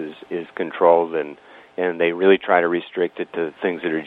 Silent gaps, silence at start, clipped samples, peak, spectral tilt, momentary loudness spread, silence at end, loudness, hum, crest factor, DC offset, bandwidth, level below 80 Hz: none; 0 s; under 0.1%; -2 dBFS; -8 dB/octave; 14 LU; 0 s; -20 LUFS; none; 20 dB; under 0.1%; 4.2 kHz; -72 dBFS